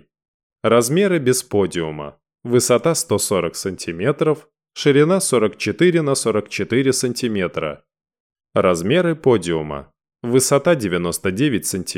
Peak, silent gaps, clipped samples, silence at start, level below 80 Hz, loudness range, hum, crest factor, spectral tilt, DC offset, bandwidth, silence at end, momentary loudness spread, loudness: -4 dBFS; 8.20-8.30 s; under 0.1%; 0.65 s; -54 dBFS; 2 LU; none; 16 dB; -4.5 dB/octave; under 0.1%; 17 kHz; 0 s; 11 LU; -18 LUFS